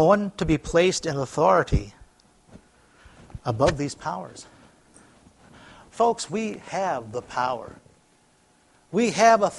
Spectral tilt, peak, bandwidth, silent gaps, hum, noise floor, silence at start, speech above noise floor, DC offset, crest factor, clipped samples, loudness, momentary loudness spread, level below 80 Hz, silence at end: -5 dB/octave; -2 dBFS; 11.5 kHz; none; none; -61 dBFS; 0 s; 38 dB; under 0.1%; 22 dB; under 0.1%; -24 LUFS; 16 LU; -42 dBFS; 0 s